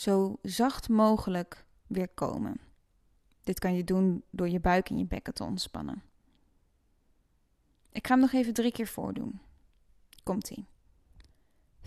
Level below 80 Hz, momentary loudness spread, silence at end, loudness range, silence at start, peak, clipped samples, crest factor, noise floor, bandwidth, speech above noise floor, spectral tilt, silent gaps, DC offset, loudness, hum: -50 dBFS; 16 LU; 0 s; 4 LU; 0 s; -10 dBFS; under 0.1%; 20 dB; -70 dBFS; 13.5 kHz; 41 dB; -6 dB/octave; none; under 0.1%; -30 LUFS; none